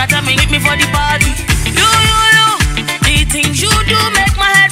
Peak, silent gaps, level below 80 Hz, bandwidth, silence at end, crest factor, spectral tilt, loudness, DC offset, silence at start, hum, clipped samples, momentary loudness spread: 0 dBFS; none; -20 dBFS; 19 kHz; 0 s; 12 dB; -2.5 dB/octave; -10 LUFS; under 0.1%; 0 s; none; 0.3%; 5 LU